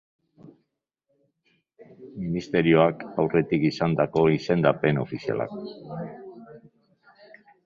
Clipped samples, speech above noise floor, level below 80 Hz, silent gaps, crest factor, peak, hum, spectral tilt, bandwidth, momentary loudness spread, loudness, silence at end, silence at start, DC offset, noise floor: under 0.1%; 54 dB; -58 dBFS; none; 22 dB; -4 dBFS; none; -8 dB/octave; 7.2 kHz; 18 LU; -24 LUFS; 1.05 s; 0.45 s; under 0.1%; -78 dBFS